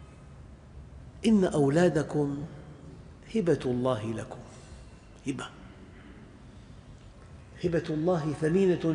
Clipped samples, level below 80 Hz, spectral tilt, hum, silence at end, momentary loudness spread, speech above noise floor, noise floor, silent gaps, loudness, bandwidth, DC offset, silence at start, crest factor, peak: under 0.1%; -52 dBFS; -7 dB/octave; none; 0 s; 25 LU; 23 dB; -49 dBFS; none; -28 LUFS; 10.5 kHz; under 0.1%; 0 s; 18 dB; -12 dBFS